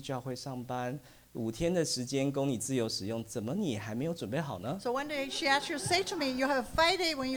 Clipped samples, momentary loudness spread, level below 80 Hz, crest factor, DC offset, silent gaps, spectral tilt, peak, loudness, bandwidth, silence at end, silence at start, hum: under 0.1%; 10 LU; -58 dBFS; 18 dB; under 0.1%; none; -4 dB/octave; -14 dBFS; -32 LUFS; over 20 kHz; 0 s; 0 s; none